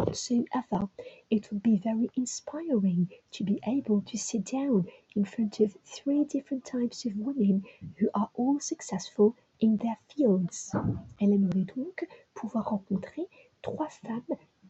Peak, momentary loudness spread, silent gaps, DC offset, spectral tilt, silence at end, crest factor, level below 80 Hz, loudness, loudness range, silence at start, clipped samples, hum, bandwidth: -12 dBFS; 10 LU; none; under 0.1%; -6.5 dB/octave; 0.35 s; 18 dB; -64 dBFS; -30 LUFS; 3 LU; 0 s; under 0.1%; none; 8.4 kHz